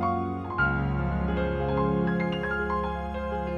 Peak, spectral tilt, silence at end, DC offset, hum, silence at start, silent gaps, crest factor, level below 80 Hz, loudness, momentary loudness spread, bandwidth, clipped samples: -12 dBFS; -9 dB/octave; 0 s; under 0.1%; none; 0 s; none; 14 dB; -36 dBFS; -28 LUFS; 6 LU; 6.6 kHz; under 0.1%